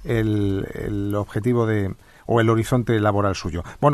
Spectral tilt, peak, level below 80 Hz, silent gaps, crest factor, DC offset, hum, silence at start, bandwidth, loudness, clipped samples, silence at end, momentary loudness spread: -7.5 dB/octave; -4 dBFS; -42 dBFS; none; 16 dB; under 0.1%; none; 0 s; 13 kHz; -22 LUFS; under 0.1%; 0 s; 9 LU